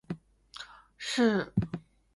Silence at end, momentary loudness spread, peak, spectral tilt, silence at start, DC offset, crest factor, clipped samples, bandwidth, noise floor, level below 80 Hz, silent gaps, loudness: 0.35 s; 20 LU; -14 dBFS; -5.5 dB/octave; 0.1 s; under 0.1%; 20 dB; under 0.1%; 11.5 kHz; -50 dBFS; -54 dBFS; none; -30 LUFS